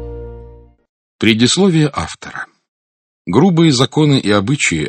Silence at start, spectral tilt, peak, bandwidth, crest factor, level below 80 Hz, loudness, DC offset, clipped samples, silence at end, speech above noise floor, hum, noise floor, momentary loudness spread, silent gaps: 0 s; -5 dB/octave; 0 dBFS; 9 kHz; 16 dB; -40 dBFS; -13 LUFS; under 0.1%; under 0.1%; 0 s; 26 dB; none; -39 dBFS; 20 LU; 0.89-1.19 s, 2.68-3.25 s